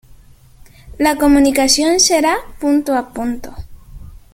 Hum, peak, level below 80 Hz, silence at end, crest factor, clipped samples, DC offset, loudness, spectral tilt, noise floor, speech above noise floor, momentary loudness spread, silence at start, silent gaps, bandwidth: none; 0 dBFS; -36 dBFS; 0.15 s; 16 dB; under 0.1%; under 0.1%; -14 LUFS; -2 dB/octave; -43 dBFS; 29 dB; 12 LU; 0.85 s; none; 16.5 kHz